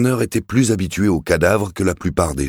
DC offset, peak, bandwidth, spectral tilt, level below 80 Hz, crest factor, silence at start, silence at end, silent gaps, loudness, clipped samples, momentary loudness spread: under 0.1%; -2 dBFS; 18.5 kHz; -6 dB/octave; -36 dBFS; 16 dB; 0 s; 0 s; none; -18 LUFS; under 0.1%; 4 LU